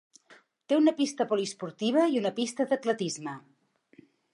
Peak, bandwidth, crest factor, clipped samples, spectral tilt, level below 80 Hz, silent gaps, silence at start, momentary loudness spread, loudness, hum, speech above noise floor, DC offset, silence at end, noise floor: -12 dBFS; 11.5 kHz; 18 dB; under 0.1%; -4.5 dB/octave; -84 dBFS; none; 0.7 s; 11 LU; -28 LUFS; none; 32 dB; under 0.1%; 0.95 s; -60 dBFS